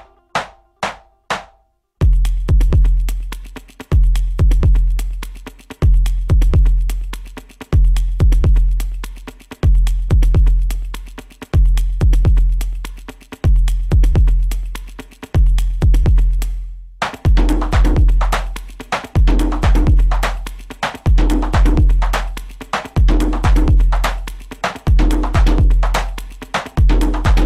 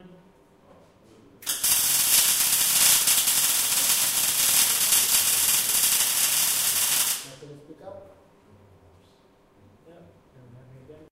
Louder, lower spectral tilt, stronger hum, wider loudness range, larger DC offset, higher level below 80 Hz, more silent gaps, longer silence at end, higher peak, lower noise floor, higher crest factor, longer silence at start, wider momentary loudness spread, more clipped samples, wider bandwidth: about the same, -17 LUFS vs -19 LUFS; first, -6.5 dB/octave vs 1.5 dB/octave; neither; second, 2 LU vs 8 LU; neither; first, -14 dBFS vs -60 dBFS; neither; second, 0 s vs 0.2 s; about the same, -4 dBFS vs -4 dBFS; about the same, -57 dBFS vs -58 dBFS; second, 10 dB vs 20 dB; first, 0.35 s vs 0.05 s; first, 17 LU vs 5 LU; neither; second, 12 kHz vs 16 kHz